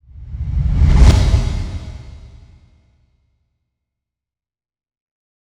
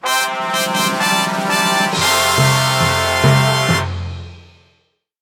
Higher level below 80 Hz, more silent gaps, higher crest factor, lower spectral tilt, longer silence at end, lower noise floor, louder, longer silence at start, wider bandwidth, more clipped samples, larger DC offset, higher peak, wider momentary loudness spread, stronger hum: first, -20 dBFS vs -44 dBFS; neither; about the same, 18 dB vs 16 dB; first, -6.5 dB/octave vs -3.5 dB/octave; first, 3.35 s vs 0.8 s; first, under -90 dBFS vs -62 dBFS; about the same, -16 LUFS vs -14 LUFS; first, 0.2 s vs 0.05 s; second, 10.5 kHz vs 19 kHz; neither; neither; about the same, 0 dBFS vs 0 dBFS; first, 23 LU vs 6 LU; neither